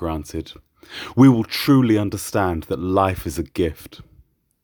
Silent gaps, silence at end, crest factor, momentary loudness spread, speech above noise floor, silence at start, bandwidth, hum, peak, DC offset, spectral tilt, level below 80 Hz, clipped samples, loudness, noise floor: none; 0.7 s; 18 dB; 19 LU; 36 dB; 0 s; over 20 kHz; none; -2 dBFS; under 0.1%; -6.5 dB/octave; -42 dBFS; under 0.1%; -19 LUFS; -56 dBFS